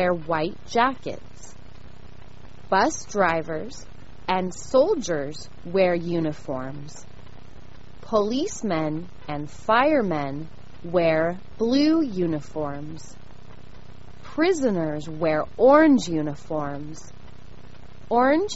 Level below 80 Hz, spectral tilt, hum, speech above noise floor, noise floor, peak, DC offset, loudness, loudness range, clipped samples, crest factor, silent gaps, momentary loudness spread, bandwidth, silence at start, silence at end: -50 dBFS; -4.5 dB/octave; none; 23 dB; -46 dBFS; -4 dBFS; 2%; -23 LUFS; 6 LU; under 0.1%; 20 dB; none; 17 LU; 8 kHz; 0 s; 0 s